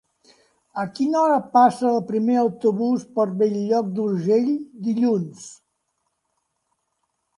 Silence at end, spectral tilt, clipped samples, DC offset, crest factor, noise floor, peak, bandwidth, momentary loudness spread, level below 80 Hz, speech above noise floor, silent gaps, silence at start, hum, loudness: 1.85 s; -7 dB/octave; under 0.1%; under 0.1%; 18 dB; -74 dBFS; -6 dBFS; 11.5 kHz; 13 LU; -72 dBFS; 54 dB; none; 0.75 s; none; -21 LUFS